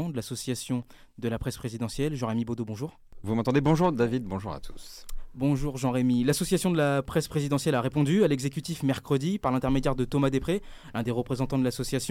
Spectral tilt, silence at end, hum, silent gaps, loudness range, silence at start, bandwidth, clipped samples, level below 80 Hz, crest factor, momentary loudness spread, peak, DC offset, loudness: -6 dB/octave; 0 s; none; none; 3 LU; 0 s; 16.5 kHz; under 0.1%; -44 dBFS; 18 dB; 11 LU; -10 dBFS; under 0.1%; -28 LUFS